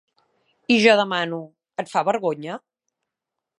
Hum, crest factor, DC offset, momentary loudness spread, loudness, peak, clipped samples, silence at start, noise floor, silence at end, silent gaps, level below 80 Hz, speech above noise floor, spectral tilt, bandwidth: none; 22 dB; under 0.1%; 19 LU; -20 LUFS; -2 dBFS; under 0.1%; 0.7 s; -85 dBFS; 1 s; none; -78 dBFS; 64 dB; -4.5 dB/octave; 11.5 kHz